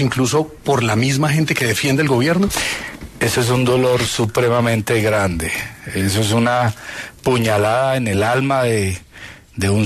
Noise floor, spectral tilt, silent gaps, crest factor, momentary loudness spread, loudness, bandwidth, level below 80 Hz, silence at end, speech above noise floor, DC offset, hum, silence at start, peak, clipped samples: -38 dBFS; -5 dB/octave; none; 14 dB; 9 LU; -17 LUFS; 13.5 kHz; -42 dBFS; 0 s; 22 dB; under 0.1%; none; 0 s; -2 dBFS; under 0.1%